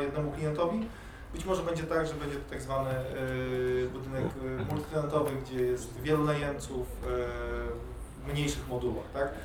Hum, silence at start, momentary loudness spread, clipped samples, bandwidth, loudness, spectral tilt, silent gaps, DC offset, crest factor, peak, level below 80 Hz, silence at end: none; 0 s; 7 LU; under 0.1%; 19 kHz; -33 LUFS; -6 dB/octave; none; under 0.1%; 18 dB; -14 dBFS; -44 dBFS; 0 s